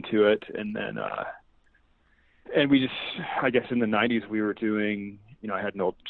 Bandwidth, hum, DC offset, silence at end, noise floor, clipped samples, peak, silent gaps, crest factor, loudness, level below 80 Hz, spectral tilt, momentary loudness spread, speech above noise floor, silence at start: 4.4 kHz; none; under 0.1%; 0 s; -64 dBFS; under 0.1%; -10 dBFS; none; 18 dB; -27 LUFS; -62 dBFS; -9 dB/octave; 11 LU; 37 dB; 0 s